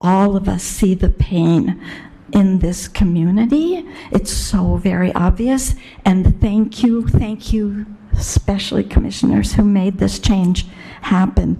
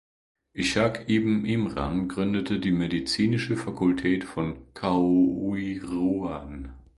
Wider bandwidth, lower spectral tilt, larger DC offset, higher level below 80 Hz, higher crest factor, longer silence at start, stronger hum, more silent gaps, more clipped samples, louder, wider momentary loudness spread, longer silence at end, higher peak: first, 14 kHz vs 11.5 kHz; about the same, -6 dB/octave vs -6 dB/octave; neither; first, -24 dBFS vs -48 dBFS; about the same, 14 dB vs 18 dB; second, 0.05 s vs 0.55 s; neither; neither; neither; first, -16 LUFS vs -26 LUFS; about the same, 8 LU vs 9 LU; second, 0 s vs 0.15 s; first, 0 dBFS vs -8 dBFS